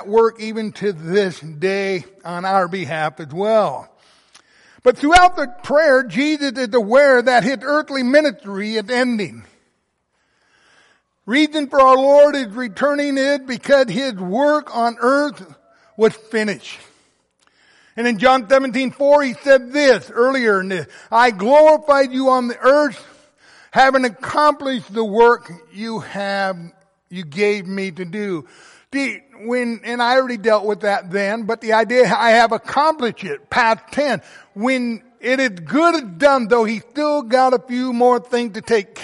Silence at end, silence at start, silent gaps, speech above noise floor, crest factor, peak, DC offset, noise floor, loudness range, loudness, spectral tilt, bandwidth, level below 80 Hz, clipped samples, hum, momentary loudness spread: 0 s; 0 s; none; 52 dB; 16 dB; -2 dBFS; under 0.1%; -68 dBFS; 7 LU; -17 LUFS; -4.5 dB/octave; 11.5 kHz; -50 dBFS; under 0.1%; none; 13 LU